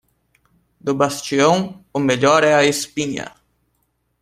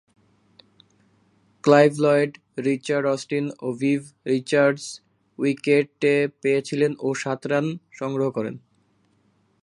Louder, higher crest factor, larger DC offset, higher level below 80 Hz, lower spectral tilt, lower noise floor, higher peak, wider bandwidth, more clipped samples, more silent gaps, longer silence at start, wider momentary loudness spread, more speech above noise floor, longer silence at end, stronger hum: first, -17 LUFS vs -23 LUFS; about the same, 18 dB vs 22 dB; neither; first, -58 dBFS vs -74 dBFS; second, -4 dB/octave vs -6 dB/octave; first, -68 dBFS vs -64 dBFS; about the same, 0 dBFS vs 0 dBFS; first, 15.5 kHz vs 11.5 kHz; neither; neither; second, 0.85 s vs 1.65 s; about the same, 13 LU vs 12 LU; first, 51 dB vs 42 dB; second, 0.9 s vs 1.05 s; neither